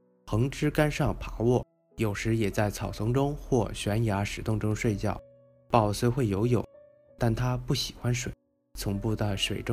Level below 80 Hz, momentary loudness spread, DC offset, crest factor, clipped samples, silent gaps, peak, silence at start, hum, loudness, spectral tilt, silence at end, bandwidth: -44 dBFS; 7 LU; under 0.1%; 22 dB; under 0.1%; none; -6 dBFS; 0.25 s; none; -29 LUFS; -6 dB/octave; 0 s; 15.5 kHz